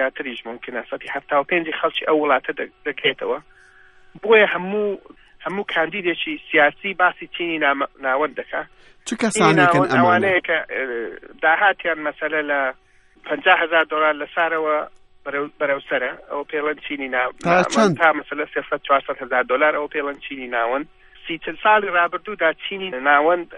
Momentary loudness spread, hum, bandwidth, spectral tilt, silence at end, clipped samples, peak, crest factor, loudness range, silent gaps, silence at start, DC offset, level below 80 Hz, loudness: 14 LU; none; 11 kHz; -4.5 dB/octave; 0 s; under 0.1%; -2 dBFS; 20 dB; 4 LU; none; 0 s; under 0.1%; -58 dBFS; -20 LUFS